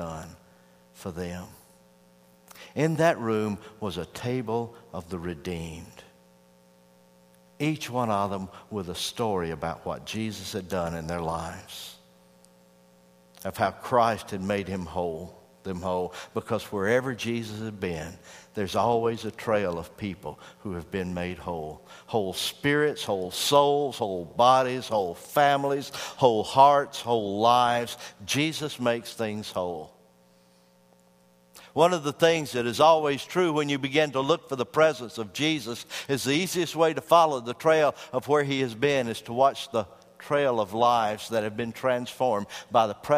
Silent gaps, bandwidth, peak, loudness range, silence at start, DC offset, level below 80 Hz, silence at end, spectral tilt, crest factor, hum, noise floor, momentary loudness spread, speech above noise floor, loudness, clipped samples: none; 15.5 kHz; -4 dBFS; 10 LU; 0 s; under 0.1%; -58 dBFS; 0 s; -4.5 dB/octave; 22 dB; 60 Hz at -60 dBFS; -60 dBFS; 16 LU; 34 dB; -26 LUFS; under 0.1%